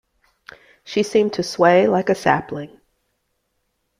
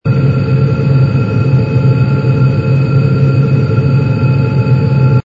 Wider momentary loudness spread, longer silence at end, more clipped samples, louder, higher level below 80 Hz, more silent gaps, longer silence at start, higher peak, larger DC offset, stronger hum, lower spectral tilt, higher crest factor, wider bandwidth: first, 17 LU vs 1 LU; first, 1.35 s vs 0.05 s; neither; second, -18 LUFS vs -11 LUFS; second, -60 dBFS vs -34 dBFS; neither; first, 0.85 s vs 0.05 s; about the same, -2 dBFS vs 0 dBFS; neither; neither; second, -5.5 dB/octave vs -10 dB/octave; first, 18 dB vs 10 dB; first, 15 kHz vs 5.2 kHz